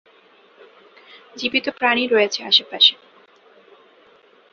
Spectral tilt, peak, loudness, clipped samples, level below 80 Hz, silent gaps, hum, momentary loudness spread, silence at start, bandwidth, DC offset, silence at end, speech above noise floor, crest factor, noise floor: -1.5 dB/octave; 0 dBFS; -17 LUFS; under 0.1%; -72 dBFS; none; none; 8 LU; 1.35 s; 7.2 kHz; under 0.1%; 1.6 s; 34 dB; 22 dB; -53 dBFS